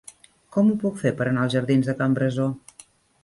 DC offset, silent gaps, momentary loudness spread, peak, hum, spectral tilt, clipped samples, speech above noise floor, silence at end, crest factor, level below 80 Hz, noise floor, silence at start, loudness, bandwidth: under 0.1%; none; 7 LU; -8 dBFS; none; -7 dB/octave; under 0.1%; 31 dB; 0.65 s; 16 dB; -60 dBFS; -52 dBFS; 0.55 s; -23 LUFS; 11.5 kHz